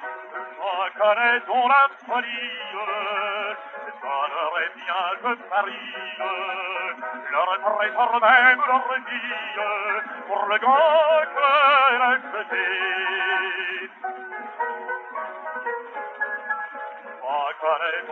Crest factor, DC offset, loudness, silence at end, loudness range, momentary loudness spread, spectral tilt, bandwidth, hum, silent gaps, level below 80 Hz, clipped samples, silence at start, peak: 18 dB; under 0.1%; -22 LUFS; 0 s; 9 LU; 15 LU; 3 dB/octave; 6.4 kHz; none; none; under -90 dBFS; under 0.1%; 0 s; -4 dBFS